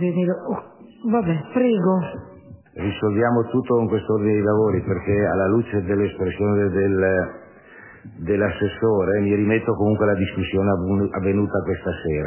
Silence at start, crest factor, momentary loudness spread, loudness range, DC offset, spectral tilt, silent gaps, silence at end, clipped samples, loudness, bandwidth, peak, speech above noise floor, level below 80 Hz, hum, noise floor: 0 s; 14 dB; 8 LU; 2 LU; under 0.1%; -12 dB/octave; none; 0 s; under 0.1%; -21 LUFS; 3.2 kHz; -6 dBFS; 24 dB; -42 dBFS; none; -45 dBFS